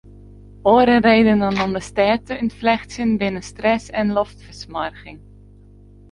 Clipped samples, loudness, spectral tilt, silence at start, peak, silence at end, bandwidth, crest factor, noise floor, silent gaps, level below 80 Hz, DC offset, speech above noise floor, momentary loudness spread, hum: under 0.1%; -18 LUFS; -6 dB/octave; 0.65 s; -2 dBFS; 0.95 s; 11 kHz; 18 dB; -45 dBFS; none; -44 dBFS; under 0.1%; 27 dB; 14 LU; 50 Hz at -40 dBFS